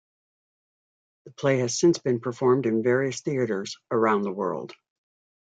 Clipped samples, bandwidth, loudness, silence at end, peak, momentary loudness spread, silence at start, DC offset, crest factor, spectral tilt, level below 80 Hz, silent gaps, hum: under 0.1%; 9.2 kHz; -25 LUFS; 0.75 s; -8 dBFS; 8 LU; 1.25 s; under 0.1%; 18 dB; -5.5 dB/octave; -72 dBFS; none; none